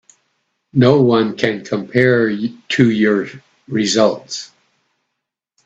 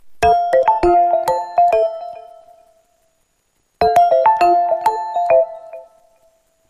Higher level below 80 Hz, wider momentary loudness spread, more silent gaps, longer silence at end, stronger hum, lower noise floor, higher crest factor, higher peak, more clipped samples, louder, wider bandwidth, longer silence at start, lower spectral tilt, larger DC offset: second, -56 dBFS vs -44 dBFS; about the same, 13 LU vs 11 LU; neither; first, 1.2 s vs 0.85 s; neither; first, -78 dBFS vs -65 dBFS; about the same, 16 dB vs 14 dB; about the same, 0 dBFS vs -2 dBFS; neither; about the same, -16 LUFS vs -15 LUFS; second, 8.4 kHz vs 14 kHz; first, 0.75 s vs 0.05 s; about the same, -5.5 dB/octave vs -5.5 dB/octave; neither